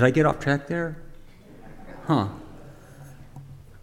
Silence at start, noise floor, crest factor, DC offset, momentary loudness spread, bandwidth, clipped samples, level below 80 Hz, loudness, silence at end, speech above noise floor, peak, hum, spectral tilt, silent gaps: 0 s; -45 dBFS; 20 dB; under 0.1%; 25 LU; 12.5 kHz; under 0.1%; -46 dBFS; -25 LUFS; 0.05 s; 23 dB; -6 dBFS; none; -7 dB/octave; none